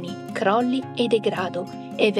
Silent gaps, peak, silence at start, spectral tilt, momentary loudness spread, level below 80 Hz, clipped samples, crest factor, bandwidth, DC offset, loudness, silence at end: none; -6 dBFS; 0 s; -5.5 dB/octave; 10 LU; -74 dBFS; under 0.1%; 18 dB; 13.5 kHz; under 0.1%; -24 LUFS; 0 s